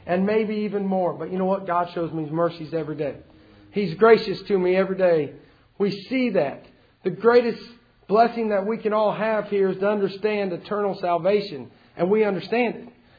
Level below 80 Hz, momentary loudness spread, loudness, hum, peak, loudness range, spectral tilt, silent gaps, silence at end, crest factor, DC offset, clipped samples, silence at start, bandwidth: -62 dBFS; 11 LU; -23 LUFS; none; -2 dBFS; 3 LU; -8.5 dB/octave; none; 0.3 s; 20 dB; under 0.1%; under 0.1%; 0.05 s; 5 kHz